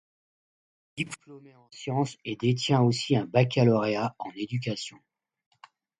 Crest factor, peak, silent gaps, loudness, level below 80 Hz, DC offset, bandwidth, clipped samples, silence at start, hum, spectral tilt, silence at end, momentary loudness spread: 22 dB; -8 dBFS; none; -27 LUFS; -66 dBFS; under 0.1%; 11 kHz; under 0.1%; 0.95 s; none; -6 dB/octave; 1.1 s; 14 LU